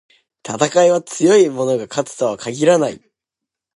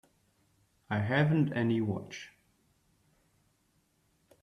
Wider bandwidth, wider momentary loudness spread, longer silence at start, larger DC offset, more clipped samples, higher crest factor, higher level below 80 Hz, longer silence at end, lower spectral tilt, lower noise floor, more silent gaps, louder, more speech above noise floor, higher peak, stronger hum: first, 11.5 kHz vs 6.8 kHz; second, 11 LU vs 18 LU; second, 0.45 s vs 0.9 s; neither; neither; about the same, 18 dB vs 20 dB; first, -64 dBFS vs -70 dBFS; second, 0.8 s vs 2.15 s; second, -4.5 dB/octave vs -7.5 dB/octave; first, -84 dBFS vs -73 dBFS; neither; first, -16 LUFS vs -30 LUFS; first, 68 dB vs 43 dB; first, 0 dBFS vs -14 dBFS; neither